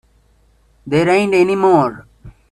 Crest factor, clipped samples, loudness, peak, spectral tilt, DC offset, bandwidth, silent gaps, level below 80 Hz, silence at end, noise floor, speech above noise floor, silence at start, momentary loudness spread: 16 dB; under 0.1%; -14 LUFS; 0 dBFS; -6.5 dB/octave; under 0.1%; 11.5 kHz; none; -48 dBFS; 0.2 s; -54 dBFS; 41 dB; 0.85 s; 6 LU